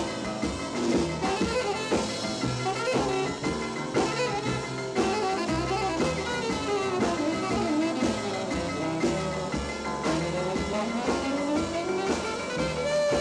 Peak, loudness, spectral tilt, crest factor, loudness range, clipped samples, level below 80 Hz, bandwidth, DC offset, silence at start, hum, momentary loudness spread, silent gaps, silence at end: -12 dBFS; -28 LUFS; -4.5 dB/octave; 14 dB; 1 LU; under 0.1%; -48 dBFS; 12.5 kHz; under 0.1%; 0 s; none; 4 LU; none; 0 s